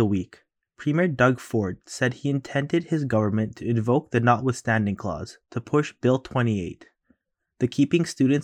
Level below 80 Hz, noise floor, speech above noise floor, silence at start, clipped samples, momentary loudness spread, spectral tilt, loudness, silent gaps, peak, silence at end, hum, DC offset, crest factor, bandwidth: -56 dBFS; -67 dBFS; 44 dB; 0 s; under 0.1%; 9 LU; -7 dB/octave; -24 LUFS; none; -6 dBFS; 0 s; none; under 0.1%; 18 dB; 12 kHz